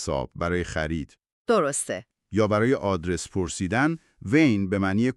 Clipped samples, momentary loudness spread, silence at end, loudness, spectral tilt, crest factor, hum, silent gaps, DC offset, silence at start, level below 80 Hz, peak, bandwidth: under 0.1%; 11 LU; 0.05 s; -25 LUFS; -5.5 dB/octave; 18 dB; none; 1.32-1.45 s; under 0.1%; 0 s; -46 dBFS; -6 dBFS; 12.5 kHz